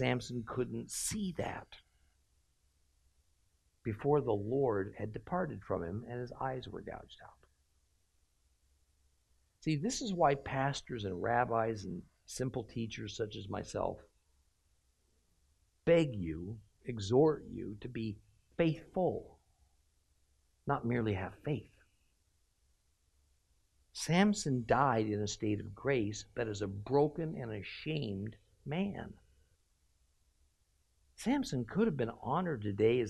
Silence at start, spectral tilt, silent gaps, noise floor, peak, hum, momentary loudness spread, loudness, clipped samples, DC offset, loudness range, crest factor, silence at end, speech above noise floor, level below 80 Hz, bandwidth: 0 s; -5.5 dB/octave; none; -75 dBFS; -14 dBFS; none; 15 LU; -36 LUFS; under 0.1%; under 0.1%; 9 LU; 22 dB; 0 s; 40 dB; -62 dBFS; 13 kHz